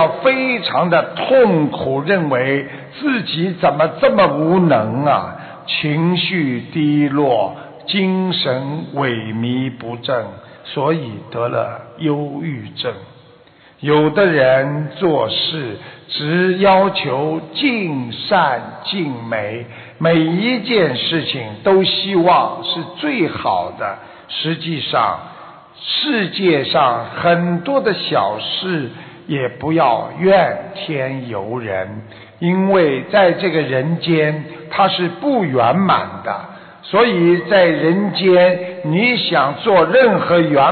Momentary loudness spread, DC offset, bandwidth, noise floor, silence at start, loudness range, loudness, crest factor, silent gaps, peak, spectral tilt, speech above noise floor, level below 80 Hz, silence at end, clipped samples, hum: 12 LU; under 0.1%; 4.8 kHz; -46 dBFS; 0 s; 5 LU; -16 LUFS; 14 dB; none; -2 dBFS; -10.5 dB/octave; 31 dB; -56 dBFS; 0 s; under 0.1%; none